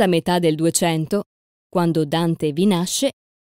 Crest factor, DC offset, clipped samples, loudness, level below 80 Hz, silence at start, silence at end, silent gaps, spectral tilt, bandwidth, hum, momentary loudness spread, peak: 16 dB; under 0.1%; under 0.1%; -20 LUFS; -58 dBFS; 0 s; 0.4 s; 1.26-1.70 s; -5 dB/octave; 16.5 kHz; none; 7 LU; -4 dBFS